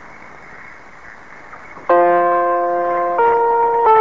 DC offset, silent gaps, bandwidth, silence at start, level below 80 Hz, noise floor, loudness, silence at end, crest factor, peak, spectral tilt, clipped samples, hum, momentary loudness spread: 0.8%; none; 7.2 kHz; 0.05 s; -56 dBFS; -39 dBFS; -15 LUFS; 0 s; 14 dB; -2 dBFS; -7 dB/octave; under 0.1%; none; 24 LU